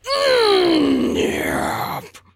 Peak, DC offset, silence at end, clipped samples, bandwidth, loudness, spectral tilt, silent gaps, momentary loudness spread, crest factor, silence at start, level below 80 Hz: -4 dBFS; under 0.1%; 0.2 s; under 0.1%; 16 kHz; -18 LUFS; -4 dB/octave; none; 11 LU; 14 dB; 0.05 s; -46 dBFS